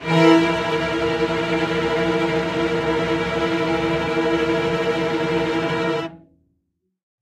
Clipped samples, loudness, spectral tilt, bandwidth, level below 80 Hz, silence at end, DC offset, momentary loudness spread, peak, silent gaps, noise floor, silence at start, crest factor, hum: under 0.1%; -20 LUFS; -6 dB/octave; 11.5 kHz; -44 dBFS; 1.05 s; under 0.1%; 5 LU; -2 dBFS; none; -73 dBFS; 0 s; 18 dB; none